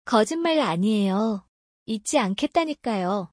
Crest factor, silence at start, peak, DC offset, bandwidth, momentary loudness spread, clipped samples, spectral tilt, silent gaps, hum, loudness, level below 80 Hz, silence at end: 18 dB; 0.05 s; -6 dBFS; under 0.1%; 10.5 kHz; 7 LU; under 0.1%; -5 dB/octave; 1.48-1.86 s; none; -24 LUFS; -64 dBFS; 0.05 s